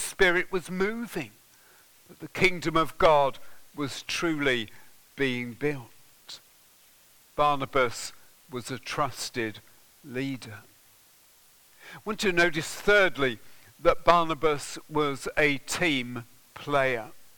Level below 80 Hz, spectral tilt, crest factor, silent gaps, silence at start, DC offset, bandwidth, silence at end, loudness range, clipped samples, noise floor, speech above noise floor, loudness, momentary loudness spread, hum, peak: -50 dBFS; -4 dB/octave; 28 dB; none; 0 s; under 0.1%; 19 kHz; 0.1 s; 9 LU; under 0.1%; -58 dBFS; 32 dB; -27 LUFS; 19 LU; none; 0 dBFS